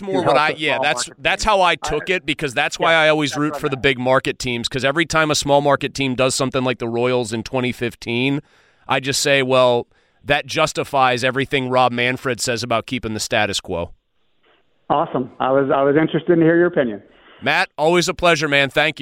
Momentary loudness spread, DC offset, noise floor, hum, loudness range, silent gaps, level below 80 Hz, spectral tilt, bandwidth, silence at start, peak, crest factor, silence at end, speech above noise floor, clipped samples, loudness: 8 LU; under 0.1%; -63 dBFS; none; 4 LU; none; -46 dBFS; -4 dB/octave; 16.5 kHz; 0 s; -2 dBFS; 16 dB; 0 s; 45 dB; under 0.1%; -18 LUFS